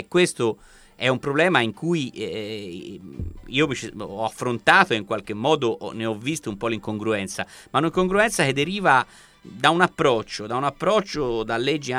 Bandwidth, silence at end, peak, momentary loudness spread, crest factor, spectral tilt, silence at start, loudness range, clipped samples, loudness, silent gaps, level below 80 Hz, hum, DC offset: 15 kHz; 0 s; 0 dBFS; 13 LU; 22 dB; -4.5 dB/octave; 0 s; 4 LU; under 0.1%; -22 LUFS; none; -50 dBFS; none; under 0.1%